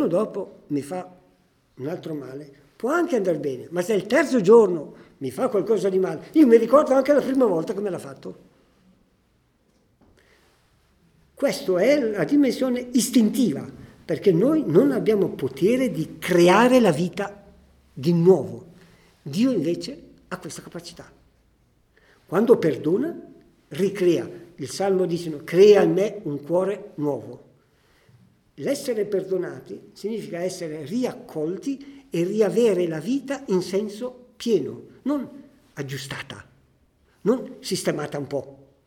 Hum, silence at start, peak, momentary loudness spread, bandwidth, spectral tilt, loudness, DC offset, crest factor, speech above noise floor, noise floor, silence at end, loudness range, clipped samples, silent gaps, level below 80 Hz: none; 0 s; -4 dBFS; 19 LU; 17.5 kHz; -6 dB/octave; -22 LUFS; under 0.1%; 20 dB; 43 dB; -64 dBFS; 0.3 s; 10 LU; under 0.1%; none; -62 dBFS